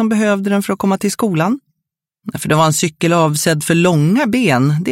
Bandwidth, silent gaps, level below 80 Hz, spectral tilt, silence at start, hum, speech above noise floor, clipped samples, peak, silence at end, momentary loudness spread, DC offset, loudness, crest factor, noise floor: 16.5 kHz; none; -54 dBFS; -5.5 dB/octave; 0 s; none; 64 dB; under 0.1%; 0 dBFS; 0 s; 6 LU; under 0.1%; -15 LUFS; 14 dB; -78 dBFS